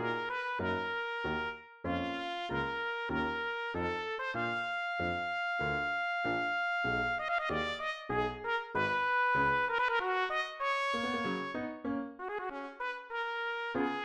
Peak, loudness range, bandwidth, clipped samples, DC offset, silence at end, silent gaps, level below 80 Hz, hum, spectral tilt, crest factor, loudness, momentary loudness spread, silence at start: -18 dBFS; 4 LU; 11.5 kHz; under 0.1%; under 0.1%; 0 s; none; -58 dBFS; none; -5.5 dB/octave; 16 dB; -34 LUFS; 8 LU; 0 s